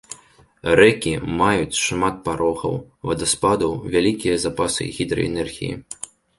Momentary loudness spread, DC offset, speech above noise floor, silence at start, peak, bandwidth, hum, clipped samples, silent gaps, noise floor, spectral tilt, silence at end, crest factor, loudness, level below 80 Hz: 14 LU; under 0.1%; 31 dB; 0.1 s; -2 dBFS; 12 kHz; none; under 0.1%; none; -52 dBFS; -4 dB/octave; 0.45 s; 20 dB; -20 LUFS; -44 dBFS